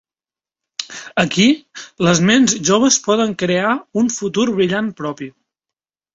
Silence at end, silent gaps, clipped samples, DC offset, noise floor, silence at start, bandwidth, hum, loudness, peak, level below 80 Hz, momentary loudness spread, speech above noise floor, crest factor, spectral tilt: 0.85 s; none; under 0.1%; under 0.1%; under -90 dBFS; 0.8 s; 8 kHz; none; -16 LUFS; 0 dBFS; -54 dBFS; 15 LU; over 74 dB; 16 dB; -4 dB/octave